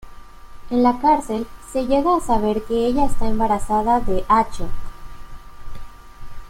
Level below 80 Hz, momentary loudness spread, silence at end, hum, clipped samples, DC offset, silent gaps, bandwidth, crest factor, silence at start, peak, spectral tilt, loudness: -32 dBFS; 10 LU; 0 s; none; under 0.1%; under 0.1%; none; 13 kHz; 16 dB; 0.05 s; -4 dBFS; -6 dB/octave; -20 LUFS